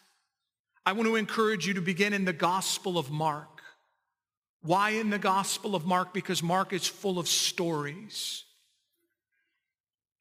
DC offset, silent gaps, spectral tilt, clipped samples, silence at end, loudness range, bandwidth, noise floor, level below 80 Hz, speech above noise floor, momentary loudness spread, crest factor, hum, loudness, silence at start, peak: under 0.1%; 4.37-4.42 s, 4.49-4.60 s; -3.5 dB/octave; under 0.1%; 1.8 s; 3 LU; 16 kHz; under -90 dBFS; -82 dBFS; over 61 dB; 8 LU; 22 dB; none; -29 LUFS; 0.85 s; -10 dBFS